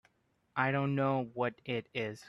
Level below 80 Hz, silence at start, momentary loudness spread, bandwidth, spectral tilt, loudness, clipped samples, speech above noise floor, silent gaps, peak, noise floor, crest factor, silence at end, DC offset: -72 dBFS; 0.55 s; 8 LU; 11.5 kHz; -7.5 dB/octave; -34 LUFS; under 0.1%; 42 dB; none; -16 dBFS; -75 dBFS; 20 dB; 0 s; under 0.1%